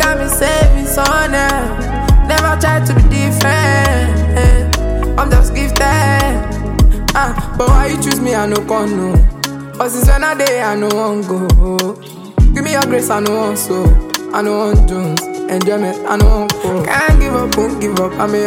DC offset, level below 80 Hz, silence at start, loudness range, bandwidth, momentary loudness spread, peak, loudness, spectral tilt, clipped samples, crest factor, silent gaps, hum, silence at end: under 0.1%; -14 dBFS; 0 s; 2 LU; 17 kHz; 6 LU; 0 dBFS; -13 LUFS; -5 dB/octave; under 0.1%; 10 dB; none; none; 0 s